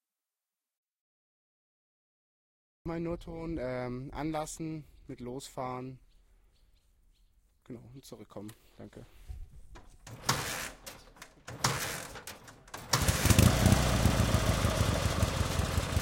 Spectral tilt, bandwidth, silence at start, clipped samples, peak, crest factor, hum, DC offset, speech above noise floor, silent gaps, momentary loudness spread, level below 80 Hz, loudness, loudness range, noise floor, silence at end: -4.5 dB/octave; 17 kHz; 2.85 s; under 0.1%; -8 dBFS; 26 dB; none; under 0.1%; over 51 dB; none; 24 LU; -42 dBFS; -31 LUFS; 23 LU; under -90 dBFS; 0 s